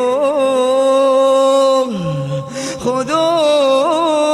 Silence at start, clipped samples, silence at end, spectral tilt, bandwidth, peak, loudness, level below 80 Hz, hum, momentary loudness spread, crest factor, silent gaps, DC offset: 0 s; under 0.1%; 0 s; -5 dB/octave; 12.5 kHz; -2 dBFS; -14 LUFS; -54 dBFS; none; 9 LU; 12 dB; none; under 0.1%